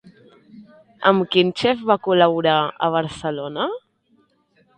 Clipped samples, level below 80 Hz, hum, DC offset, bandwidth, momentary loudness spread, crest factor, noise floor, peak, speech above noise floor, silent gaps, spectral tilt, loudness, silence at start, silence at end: under 0.1%; -60 dBFS; none; under 0.1%; 9.6 kHz; 10 LU; 20 dB; -61 dBFS; 0 dBFS; 43 dB; none; -6 dB/octave; -19 LUFS; 0.05 s; 1 s